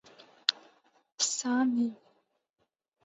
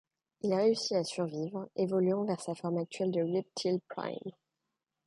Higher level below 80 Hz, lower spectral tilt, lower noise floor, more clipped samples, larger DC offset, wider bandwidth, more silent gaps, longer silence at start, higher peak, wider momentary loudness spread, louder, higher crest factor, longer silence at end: second, -88 dBFS vs -80 dBFS; second, -1 dB/octave vs -6 dB/octave; second, -64 dBFS vs -87 dBFS; neither; neither; second, 8.2 kHz vs 11.5 kHz; first, 1.12-1.18 s vs none; about the same, 0.5 s vs 0.45 s; first, -8 dBFS vs -18 dBFS; second, 6 LU vs 10 LU; first, -30 LUFS vs -33 LUFS; first, 28 dB vs 16 dB; first, 1.1 s vs 0.75 s